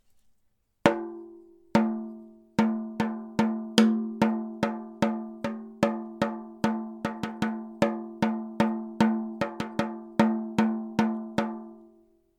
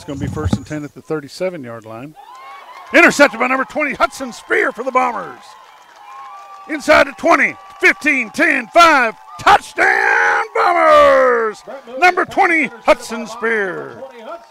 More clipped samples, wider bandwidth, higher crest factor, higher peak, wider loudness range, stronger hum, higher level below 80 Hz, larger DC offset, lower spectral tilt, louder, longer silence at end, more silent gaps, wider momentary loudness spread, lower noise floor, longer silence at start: neither; second, 12 kHz vs 16 kHz; first, 28 dB vs 16 dB; about the same, 0 dBFS vs 0 dBFS; second, 3 LU vs 6 LU; neither; second, -62 dBFS vs -44 dBFS; neither; first, -6 dB/octave vs -4 dB/octave; second, -28 LUFS vs -13 LUFS; first, 0.5 s vs 0.15 s; neither; second, 9 LU vs 21 LU; first, -70 dBFS vs -41 dBFS; first, 0.85 s vs 0 s